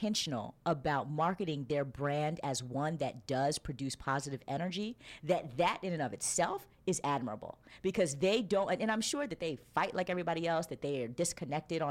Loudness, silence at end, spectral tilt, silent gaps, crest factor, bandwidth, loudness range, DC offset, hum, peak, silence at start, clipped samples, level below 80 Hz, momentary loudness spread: -35 LUFS; 0 s; -4.5 dB/octave; none; 18 dB; 16.5 kHz; 2 LU; under 0.1%; none; -18 dBFS; 0 s; under 0.1%; -62 dBFS; 7 LU